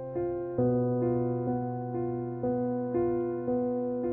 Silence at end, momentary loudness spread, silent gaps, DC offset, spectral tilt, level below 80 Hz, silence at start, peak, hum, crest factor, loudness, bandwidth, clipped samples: 0 s; 5 LU; none; under 0.1%; -12.5 dB/octave; -58 dBFS; 0 s; -16 dBFS; none; 12 dB; -30 LUFS; 2.6 kHz; under 0.1%